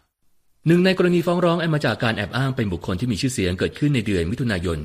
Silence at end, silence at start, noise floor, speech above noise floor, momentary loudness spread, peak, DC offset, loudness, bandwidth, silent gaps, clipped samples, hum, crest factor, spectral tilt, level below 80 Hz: 0 s; 0.65 s; -60 dBFS; 40 dB; 7 LU; -6 dBFS; under 0.1%; -21 LUFS; 15 kHz; none; under 0.1%; none; 16 dB; -6 dB/octave; -44 dBFS